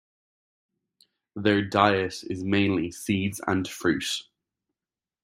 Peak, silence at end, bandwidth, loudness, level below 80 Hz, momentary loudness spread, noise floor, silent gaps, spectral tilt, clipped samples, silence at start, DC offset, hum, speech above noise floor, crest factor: -4 dBFS; 1 s; 16 kHz; -26 LUFS; -62 dBFS; 10 LU; under -90 dBFS; none; -5 dB/octave; under 0.1%; 1.35 s; under 0.1%; none; over 65 dB; 24 dB